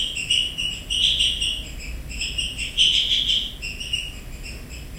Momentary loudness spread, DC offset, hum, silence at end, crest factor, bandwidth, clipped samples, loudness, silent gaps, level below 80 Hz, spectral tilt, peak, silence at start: 18 LU; under 0.1%; none; 0 s; 18 dB; 16.5 kHz; under 0.1%; -20 LUFS; none; -36 dBFS; -0.5 dB/octave; -6 dBFS; 0 s